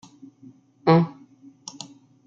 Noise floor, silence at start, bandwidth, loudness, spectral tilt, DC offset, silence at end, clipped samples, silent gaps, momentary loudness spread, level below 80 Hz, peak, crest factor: -51 dBFS; 0.85 s; 7.4 kHz; -21 LUFS; -7 dB/octave; under 0.1%; 1.2 s; under 0.1%; none; 22 LU; -70 dBFS; -4 dBFS; 22 dB